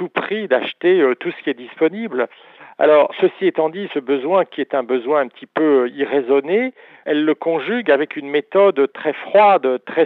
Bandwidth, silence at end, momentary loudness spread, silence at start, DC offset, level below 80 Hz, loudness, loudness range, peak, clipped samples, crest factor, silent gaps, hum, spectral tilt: 4.3 kHz; 0 s; 10 LU; 0 s; under 0.1%; -80 dBFS; -18 LUFS; 2 LU; -2 dBFS; under 0.1%; 16 dB; none; none; -8 dB/octave